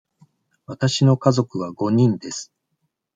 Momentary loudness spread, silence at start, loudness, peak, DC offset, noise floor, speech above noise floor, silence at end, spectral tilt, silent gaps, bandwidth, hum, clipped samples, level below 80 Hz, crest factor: 16 LU; 0.7 s; -20 LUFS; -2 dBFS; under 0.1%; -74 dBFS; 55 dB; 0.7 s; -6.5 dB/octave; none; 9.2 kHz; none; under 0.1%; -62 dBFS; 18 dB